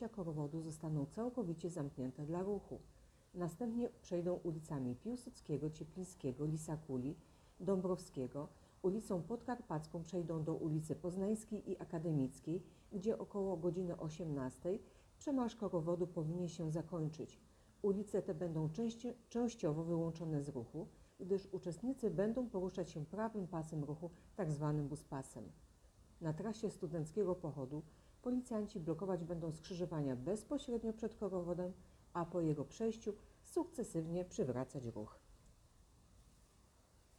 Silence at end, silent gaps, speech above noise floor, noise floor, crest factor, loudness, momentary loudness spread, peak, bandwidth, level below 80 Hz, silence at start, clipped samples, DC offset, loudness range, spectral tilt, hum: 0.9 s; none; 27 dB; -69 dBFS; 16 dB; -43 LUFS; 8 LU; -26 dBFS; 13.5 kHz; -66 dBFS; 0 s; under 0.1%; under 0.1%; 3 LU; -7.5 dB/octave; none